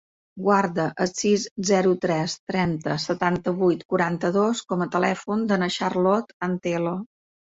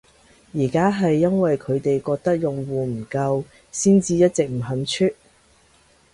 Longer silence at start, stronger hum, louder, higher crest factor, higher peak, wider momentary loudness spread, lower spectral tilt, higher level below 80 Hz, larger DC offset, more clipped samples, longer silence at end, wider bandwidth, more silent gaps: second, 0.35 s vs 0.55 s; neither; second, -24 LUFS vs -21 LUFS; about the same, 16 dB vs 16 dB; second, -8 dBFS vs -4 dBFS; second, 5 LU vs 8 LU; about the same, -5.5 dB/octave vs -6 dB/octave; second, -60 dBFS vs -54 dBFS; neither; neither; second, 0.55 s vs 1 s; second, 8 kHz vs 11.5 kHz; first, 1.51-1.56 s, 2.39-2.47 s, 3.85-3.89 s, 6.33-6.40 s vs none